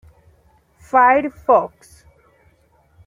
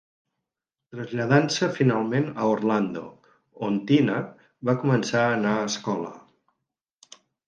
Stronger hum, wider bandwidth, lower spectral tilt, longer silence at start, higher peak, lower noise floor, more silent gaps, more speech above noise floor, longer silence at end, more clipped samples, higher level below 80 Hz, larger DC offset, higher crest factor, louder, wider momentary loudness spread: neither; first, 12 kHz vs 9.6 kHz; about the same, -6 dB/octave vs -6 dB/octave; about the same, 0.95 s vs 0.95 s; about the same, -2 dBFS vs -4 dBFS; second, -57 dBFS vs -87 dBFS; neither; second, 41 dB vs 63 dB; about the same, 1.4 s vs 1.3 s; neither; first, -54 dBFS vs -68 dBFS; neither; about the same, 18 dB vs 22 dB; first, -16 LUFS vs -24 LUFS; second, 6 LU vs 15 LU